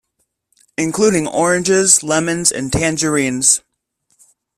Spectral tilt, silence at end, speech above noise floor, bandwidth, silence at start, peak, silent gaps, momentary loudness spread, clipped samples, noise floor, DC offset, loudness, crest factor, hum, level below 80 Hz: -3 dB/octave; 1 s; 54 dB; 15.5 kHz; 0.8 s; 0 dBFS; none; 7 LU; under 0.1%; -69 dBFS; under 0.1%; -14 LUFS; 18 dB; none; -44 dBFS